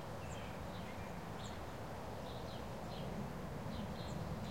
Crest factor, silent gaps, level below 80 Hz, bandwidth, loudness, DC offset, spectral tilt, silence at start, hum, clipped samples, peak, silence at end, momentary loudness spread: 14 dB; none; -56 dBFS; 16.5 kHz; -47 LUFS; 0.2%; -6 dB/octave; 0 s; none; under 0.1%; -32 dBFS; 0 s; 2 LU